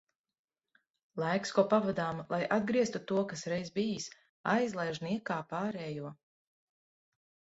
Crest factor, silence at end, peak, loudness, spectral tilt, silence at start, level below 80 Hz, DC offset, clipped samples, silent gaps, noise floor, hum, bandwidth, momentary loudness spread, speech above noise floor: 22 dB; 1.35 s; -12 dBFS; -33 LUFS; -5.5 dB/octave; 1.15 s; -72 dBFS; under 0.1%; under 0.1%; 4.29-4.44 s; -75 dBFS; none; 8 kHz; 11 LU; 42 dB